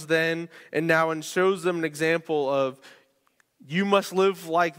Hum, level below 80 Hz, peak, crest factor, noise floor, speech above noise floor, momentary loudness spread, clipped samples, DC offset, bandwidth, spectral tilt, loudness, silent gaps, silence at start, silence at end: none; -72 dBFS; -6 dBFS; 18 dB; -67 dBFS; 43 dB; 7 LU; under 0.1%; under 0.1%; 16 kHz; -5 dB/octave; -25 LUFS; none; 0 s; 0.05 s